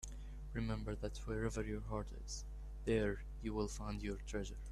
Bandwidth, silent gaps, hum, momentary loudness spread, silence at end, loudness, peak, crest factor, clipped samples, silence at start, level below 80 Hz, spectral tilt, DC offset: 12.5 kHz; none; none; 10 LU; 0 s; -43 LUFS; -24 dBFS; 18 dB; under 0.1%; 0 s; -48 dBFS; -5.5 dB/octave; under 0.1%